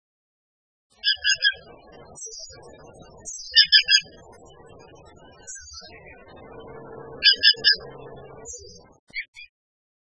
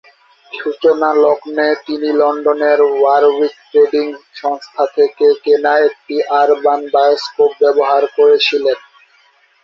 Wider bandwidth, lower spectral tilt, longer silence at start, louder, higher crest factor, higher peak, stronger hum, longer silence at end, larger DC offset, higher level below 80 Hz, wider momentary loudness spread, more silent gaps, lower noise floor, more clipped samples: first, 10 kHz vs 6.8 kHz; second, 1 dB/octave vs -3.5 dB/octave; first, 1.05 s vs 0.55 s; second, -17 LUFS vs -13 LUFS; first, 26 dB vs 12 dB; about the same, -2 dBFS vs -2 dBFS; neither; about the same, 0.75 s vs 0.85 s; neither; first, -58 dBFS vs -64 dBFS; first, 27 LU vs 9 LU; first, 8.99-9.07 s, 9.28-9.33 s vs none; about the same, -49 dBFS vs -52 dBFS; neither